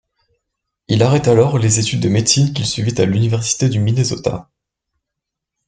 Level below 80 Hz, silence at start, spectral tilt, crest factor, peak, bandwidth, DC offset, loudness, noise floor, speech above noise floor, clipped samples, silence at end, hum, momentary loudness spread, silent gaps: -48 dBFS; 0.9 s; -5 dB/octave; 14 dB; -2 dBFS; 9.6 kHz; under 0.1%; -15 LUFS; -81 dBFS; 66 dB; under 0.1%; 1.25 s; none; 6 LU; none